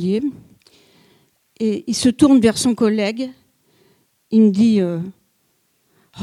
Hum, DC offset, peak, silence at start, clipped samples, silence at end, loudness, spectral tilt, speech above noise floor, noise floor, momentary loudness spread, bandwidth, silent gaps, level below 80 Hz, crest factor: none; under 0.1%; 0 dBFS; 0 s; under 0.1%; 0 s; -17 LUFS; -5.5 dB/octave; 49 dB; -64 dBFS; 15 LU; 13 kHz; none; -54 dBFS; 18 dB